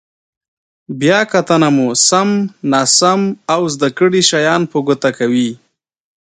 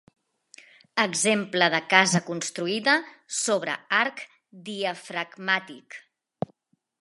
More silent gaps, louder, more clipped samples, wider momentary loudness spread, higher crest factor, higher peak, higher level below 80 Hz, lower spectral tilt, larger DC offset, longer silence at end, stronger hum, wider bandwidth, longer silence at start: neither; first, -13 LUFS vs -24 LUFS; neither; second, 6 LU vs 22 LU; second, 14 dB vs 26 dB; about the same, 0 dBFS vs -2 dBFS; first, -60 dBFS vs -76 dBFS; about the same, -3.5 dB/octave vs -2.5 dB/octave; neither; second, 0.85 s vs 1 s; neither; second, 9.6 kHz vs 11.5 kHz; about the same, 0.9 s vs 0.95 s